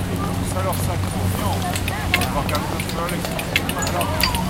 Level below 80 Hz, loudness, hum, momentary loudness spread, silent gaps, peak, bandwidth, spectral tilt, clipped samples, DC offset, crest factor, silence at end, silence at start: -34 dBFS; -22 LUFS; none; 4 LU; none; 0 dBFS; 17 kHz; -4.5 dB/octave; under 0.1%; under 0.1%; 22 dB; 0 s; 0 s